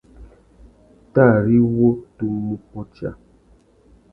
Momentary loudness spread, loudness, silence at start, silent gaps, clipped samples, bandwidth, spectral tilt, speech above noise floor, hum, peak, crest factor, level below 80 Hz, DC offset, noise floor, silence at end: 17 LU; -18 LUFS; 0.2 s; none; under 0.1%; 2.8 kHz; -12 dB/octave; 36 dB; none; 0 dBFS; 20 dB; -48 dBFS; under 0.1%; -54 dBFS; 1 s